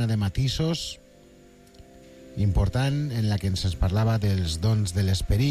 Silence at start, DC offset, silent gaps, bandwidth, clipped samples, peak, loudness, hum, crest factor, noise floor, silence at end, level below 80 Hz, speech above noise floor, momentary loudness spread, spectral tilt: 0 s; under 0.1%; none; 14 kHz; under 0.1%; -12 dBFS; -25 LUFS; none; 12 dB; -52 dBFS; 0 s; -36 dBFS; 28 dB; 4 LU; -6 dB/octave